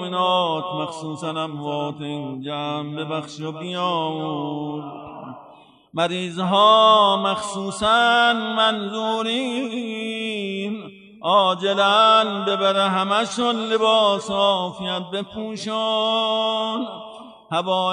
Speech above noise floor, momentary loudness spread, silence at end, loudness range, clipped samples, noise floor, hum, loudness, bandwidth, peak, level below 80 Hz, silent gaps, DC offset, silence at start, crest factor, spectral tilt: 28 dB; 14 LU; 0 s; 10 LU; under 0.1%; -48 dBFS; none; -20 LUFS; 11 kHz; -4 dBFS; -64 dBFS; none; under 0.1%; 0 s; 18 dB; -4 dB/octave